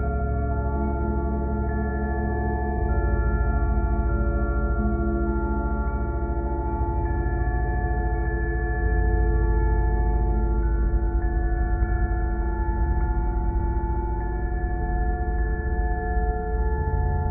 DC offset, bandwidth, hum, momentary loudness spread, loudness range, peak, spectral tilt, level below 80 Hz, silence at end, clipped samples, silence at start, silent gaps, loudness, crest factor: under 0.1%; 2.5 kHz; none; 3 LU; 2 LU; -10 dBFS; -6 dB/octave; -24 dBFS; 0 s; under 0.1%; 0 s; none; -26 LUFS; 12 dB